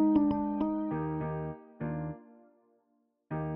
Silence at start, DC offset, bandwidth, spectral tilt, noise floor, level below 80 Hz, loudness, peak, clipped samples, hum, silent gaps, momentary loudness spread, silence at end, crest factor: 0 s; under 0.1%; 3.4 kHz; -12 dB/octave; -75 dBFS; -56 dBFS; -33 LUFS; -16 dBFS; under 0.1%; none; none; 14 LU; 0 s; 18 dB